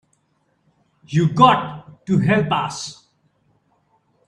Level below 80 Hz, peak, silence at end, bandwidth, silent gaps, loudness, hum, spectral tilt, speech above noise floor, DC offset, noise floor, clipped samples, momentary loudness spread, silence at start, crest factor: -56 dBFS; 0 dBFS; 1.35 s; 10.5 kHz; none; -18 LUFS; none; -6 dB/octave; 49 dB; under 0.1%; -66 dBFS; under 0.1%; 19 LU; 1.1 s; 20 dB